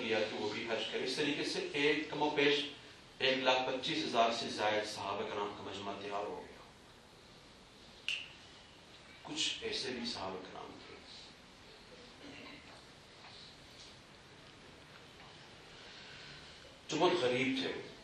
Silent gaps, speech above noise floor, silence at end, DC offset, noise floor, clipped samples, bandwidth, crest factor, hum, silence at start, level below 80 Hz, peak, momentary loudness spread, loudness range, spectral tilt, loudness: none; 23 dB; 0 s; under 0.1%; -59 dBFS; under 0.1%; 12 kHz; 22 dB; none; 0 s; -70 dBFS; -16 dBFS; 24 LU; 20 LU; -3.5 dB/octave; -35 LUFS